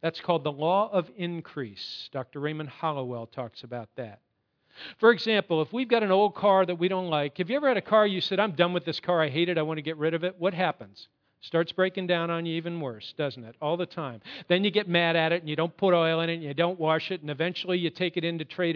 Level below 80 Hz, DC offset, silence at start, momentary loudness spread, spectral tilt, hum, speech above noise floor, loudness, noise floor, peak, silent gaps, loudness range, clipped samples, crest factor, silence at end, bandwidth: -78 dBFS; under 0.1%; 0 s; 14 LU; -7.5 dB/octave; none; 40 dB; -27 LUFS; -67 dBFS; -6 dBFS; none; 6 LU; under 0.1%; 22 dB; 0 s; 5.4 kHz